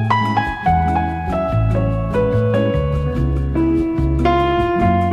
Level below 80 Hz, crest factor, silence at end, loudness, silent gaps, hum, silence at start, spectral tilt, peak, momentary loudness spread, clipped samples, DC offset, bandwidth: -26 dBFS; 12 dB; 0 s; -17 LUFS; none; none; 0 s; -8.5 dB/octave; -4 dBFS; 4 LU; under 0.1%; under 0.1%; 8.6 kHz